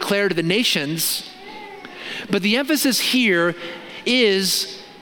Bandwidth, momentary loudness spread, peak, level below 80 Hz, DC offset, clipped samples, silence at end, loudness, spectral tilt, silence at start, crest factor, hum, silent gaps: 17.5 kHz; 18 LU; -4 dBFS; -64 dBFS; under 0.1%; under 0.1%; 0 s; -19 LUFS; -3 dB/octave; 0 s; 16 dB; none; none